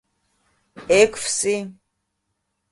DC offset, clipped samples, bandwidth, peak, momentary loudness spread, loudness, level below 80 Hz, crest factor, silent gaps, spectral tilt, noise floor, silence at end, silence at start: under 0.1%; under 0.1%; 11.5 kHz; -4 dBFS; 20 LU; -19 LUFS; -56 dBFS; 20 dB; none; -2.5 dB/octave; -75 dBFS; 1 s; 0.75 s